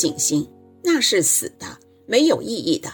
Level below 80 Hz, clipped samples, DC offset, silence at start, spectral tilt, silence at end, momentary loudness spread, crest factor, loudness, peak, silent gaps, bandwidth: -62 dBFS; under 0.1%; under 0.1%; 0 s; -2.5 dB/octave; 0 s; 17 LU; 18 dB; -19 LUFS; -2 dBFS; none; 19 kHz